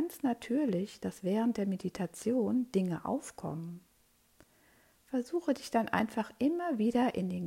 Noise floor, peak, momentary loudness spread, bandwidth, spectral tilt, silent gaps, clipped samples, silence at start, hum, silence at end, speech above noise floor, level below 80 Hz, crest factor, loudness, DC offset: -69 dBFS; -14 dBFS; 9 LU; 16 kHz; -6.5 dB/octave; none; under 0.1%; 0 s; none; 0 s; 36 dB; -70 dBFS; 20 dB; -33 LUFS; under 0.1%